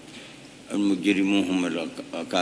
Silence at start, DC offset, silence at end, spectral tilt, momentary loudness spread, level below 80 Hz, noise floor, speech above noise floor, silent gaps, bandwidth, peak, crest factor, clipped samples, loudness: 0 s; under 0.1%; 0 s; -5 dB/octave; 20 LU; -68 dBFS; -45 dBFS; 20 dB; none; 11 kHz; -10 dBFS; 16 dB; under 0.1%; -25 LUFS